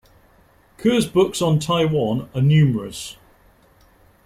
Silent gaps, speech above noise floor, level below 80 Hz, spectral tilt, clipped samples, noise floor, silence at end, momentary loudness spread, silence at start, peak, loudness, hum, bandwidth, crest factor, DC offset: none; 36 dB; -50 dBFS; -6.5 dB/octave; under 0.1%; -54 dBFS; 1.15 s; 13 LU; 0.8 s; -6 dBFS; -19 LUFS; none; 15 kHz; 16 dB; under 0.1%